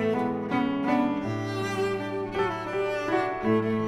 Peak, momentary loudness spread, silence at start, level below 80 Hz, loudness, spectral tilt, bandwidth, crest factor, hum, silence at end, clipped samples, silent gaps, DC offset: -12 dBFS; 5 LU; 0 s; -56 dBFS; -28 LUFS; -6.5 dB/octave; 14 kHz; 14 dB; none; 0 s; under 0.1%; none; under 0.1%